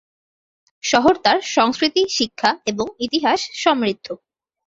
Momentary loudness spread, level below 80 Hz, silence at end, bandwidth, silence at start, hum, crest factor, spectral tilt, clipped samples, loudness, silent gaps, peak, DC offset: 10 LU; -56 dBFS; 0.5 s; 8 kHz; 0.85 s; none; 18 dB; -2.5 dB/octave; under 0.1%; -18 LUFS; none; -2 dBFS; under 0.1%